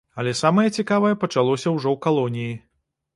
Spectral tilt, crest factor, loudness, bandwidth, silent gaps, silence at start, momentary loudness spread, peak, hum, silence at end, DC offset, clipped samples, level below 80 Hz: -6 dB/octave; 18 dB; -21 LUFS; 11.5 kHz; none; 0.15 s; 9 LU; -4 dBFS; none; 0.55 s; under 0.1%; under 0.1%; -62 dBFS